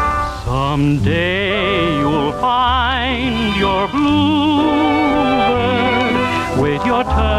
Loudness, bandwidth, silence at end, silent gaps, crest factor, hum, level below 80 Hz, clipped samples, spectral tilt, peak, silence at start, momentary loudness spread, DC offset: -15 LUFS; 12.5 kHz; 0 s; none; 10 dB; none; -28 dBFS; under 0.1%; -6.5 dB/octave; -6 dBFS; 0 s; 3 LU; under 0.1%